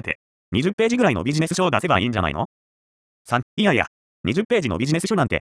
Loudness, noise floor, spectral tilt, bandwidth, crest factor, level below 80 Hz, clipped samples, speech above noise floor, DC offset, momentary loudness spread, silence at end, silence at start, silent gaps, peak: -21 LUFS; under -90 dBFS; -5.5 dB/octave; 11 kHz; 20 dB; -46 dBFS; under 0.1%; over 70 dB; under 0.1%; 10 LU; 0.05 s; 0.05 s; 0.15-0.52 s, 0.73-0.78 s, 2.45-3.25 s, 3.43-3.57 s, 3.87-4.24 s, 4.45-4.49 s; -2 dBFS